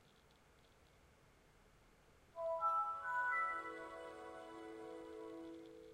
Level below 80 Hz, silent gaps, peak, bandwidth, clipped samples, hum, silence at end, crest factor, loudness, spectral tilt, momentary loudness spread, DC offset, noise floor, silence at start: -76 dBFS; none; -30 dBFS; 15.5 kHz; under 0.1%; none; 0 s; 18 dB; -43 LUFS; -4.5 dB/octave; 15 LU; under 0.1%; -69 dBFS; 0.05 s